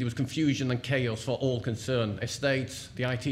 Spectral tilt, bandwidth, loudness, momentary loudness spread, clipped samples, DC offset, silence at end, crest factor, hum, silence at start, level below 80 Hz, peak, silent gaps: -5.5 dB/octave; 14.5 kHz; -30 LUFS; 4 LU; under 0.1%; under 0.1%; 0 s; 14 dB; none; 0 s; -56 dBFS; -14 dBFS; none